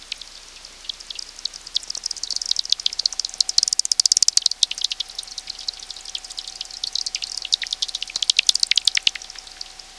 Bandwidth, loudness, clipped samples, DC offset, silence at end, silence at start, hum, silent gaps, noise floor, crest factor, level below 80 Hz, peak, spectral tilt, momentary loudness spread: 11 kHz; -20 LUFS; under 0.1%; under 0.1%; 0 s; 0 s; none; none; -42 dBFS; 22 dB; -54 dBFS; -2 dBFS; 4 dB/octave; 17 LU